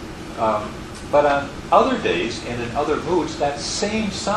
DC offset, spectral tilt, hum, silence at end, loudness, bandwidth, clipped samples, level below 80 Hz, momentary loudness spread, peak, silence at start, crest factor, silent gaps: under 0.1%; -4.5 dB/octave; none; 0 s; -21 LUFS; 12.5 kHz; under 0.1%; -42 dBFS; 9 LU; -2 dBFS; 0 s; 20 dB; none